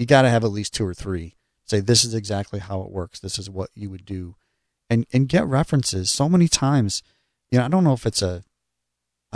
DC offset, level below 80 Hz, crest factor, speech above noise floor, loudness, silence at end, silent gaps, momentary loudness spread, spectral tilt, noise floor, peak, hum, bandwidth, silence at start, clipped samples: under 0.1%; -48 dBFS; 20 dB; 59 dB; -21 LUFS; 0.95 s; none; 16 LU; -5 dB/octave; -80 dBFS; -2 dBFS; none; 11 kHz; 0 s; under 0.1%